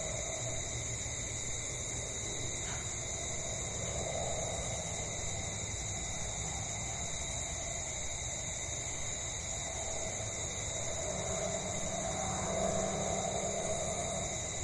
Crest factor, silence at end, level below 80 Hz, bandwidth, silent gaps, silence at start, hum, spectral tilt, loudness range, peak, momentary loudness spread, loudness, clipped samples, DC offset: 16 dB; 0 s; -50 dBFS; 12 kHz; none; 0 s; none; -2.5 dB/octave; 2 LU; -22 dBFS; 3 LU; -36 LUFS; under 0.1%; under 0.1%